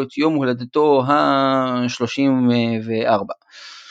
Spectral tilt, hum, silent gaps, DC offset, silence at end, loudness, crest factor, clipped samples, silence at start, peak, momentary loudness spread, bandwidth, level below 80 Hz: -6.5 dB/octave; none; none; under 0.1%; 0.05 s; -18 LUFS; 16 dB; under 0.1%; 0 s; -2 dBFS; 11 LU; 7.8 kHz; -68 dBFS